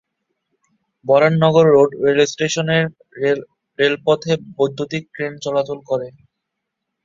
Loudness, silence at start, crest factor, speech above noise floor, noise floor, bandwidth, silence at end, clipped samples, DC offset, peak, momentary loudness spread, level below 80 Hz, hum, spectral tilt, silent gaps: -17 LUFS; 1.05 s; 18 dB; 62 dB; -78 dBFS; 7.6 kHz; 0.95 s; under 0.1%; under 0.1%; -2 dBFS; 12 LU; -60 dBFS; none; -5.5 dB/octave; none